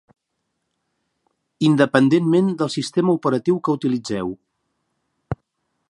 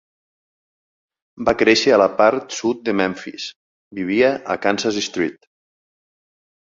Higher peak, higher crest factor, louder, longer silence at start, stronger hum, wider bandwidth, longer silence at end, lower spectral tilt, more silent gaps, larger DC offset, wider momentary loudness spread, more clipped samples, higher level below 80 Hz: about the same, 0 dBFS vs -2 dBFS; about the same, 20 dB vs 18 dB; about the same, -19 LUFS vs -18 LUFS; first, 1.6 s vs 1.4 s; neither; first, 11.5 kHz vs 7.8 kHz; second, 0.55 s vs 1.4 s; first, -6.5 dB/octave vs -4 dB/octave; second, none vs 3.56-3.91 s; neither; about the same, 17 LU vs 15 LU; neither; about the same, -56 dBFS vs -56 dBFS